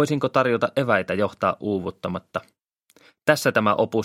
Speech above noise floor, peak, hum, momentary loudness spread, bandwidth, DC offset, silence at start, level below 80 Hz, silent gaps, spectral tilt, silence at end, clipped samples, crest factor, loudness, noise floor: 37 dB; 0 dBFS; none; 11 LU; 16.5 kHz; under 0.1%; 0 s; -62 dBFS; none; -5.5 dB/octave; 0 s; under 0.1%; 22 dB; -22 LUFS; -59 dBFS